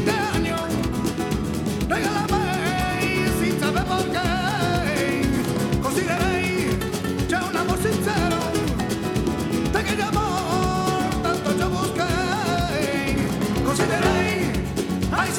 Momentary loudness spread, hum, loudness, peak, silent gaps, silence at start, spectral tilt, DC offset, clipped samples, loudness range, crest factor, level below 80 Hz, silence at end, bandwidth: 3 LU; none; -23 LUFS; -6 dBFS; none; 0 s; -5 dB/octave; under 0.1%; under 0.1%; 1 LU; 16 dB; -36 dBFS; 0 s; 19.5 kHz